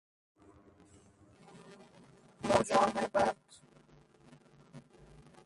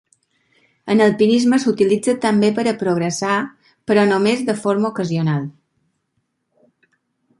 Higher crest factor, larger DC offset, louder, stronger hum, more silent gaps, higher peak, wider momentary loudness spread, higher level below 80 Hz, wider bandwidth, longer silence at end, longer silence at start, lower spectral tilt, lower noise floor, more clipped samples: first, 24 dB vs 16 dB; neither; second, -31 LUFS vs -17 LUFS; neither; neither; second, -14 dBFS vs -2 dBFS; first, 28 LU vs 8 LU; about the same, -66 dBFS vs -62 dBFS; about the same, 11.5 kHz vs 11.5 kHz; second, 0.65 s vs 1.9 s; first, 1.55 s vs 0.85 s; about the same, -4.5 dB/octave vs -5.5 dB/octave; second, -62 dBFS vs -71 dBFS; neither